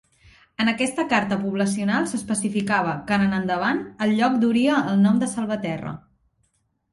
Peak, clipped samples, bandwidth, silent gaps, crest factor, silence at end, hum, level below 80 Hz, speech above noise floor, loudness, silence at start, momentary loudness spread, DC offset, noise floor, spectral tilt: -6 dBFS; under 0.1%; 11.5 kHz; none; 16 dB; 0.95 s; none; -58 dBFS; 48 dB; -22 LUFS; 0.6 s; 8 LU; under 0.1%; -70 dBFS; -5 dB/octave